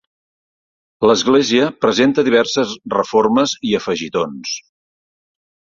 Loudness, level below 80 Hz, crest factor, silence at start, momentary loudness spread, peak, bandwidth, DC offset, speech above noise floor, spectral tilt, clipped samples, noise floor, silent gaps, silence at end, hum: -16 LUFS; -56 dBFS; 16 dB; 1 s; 8 LU; -2 dBFS; 7.6 kHz; under 0.1%; over 75 dB; -4 dB/octave; under 0.1%; under -90 dBFS; none; 1.15 s; none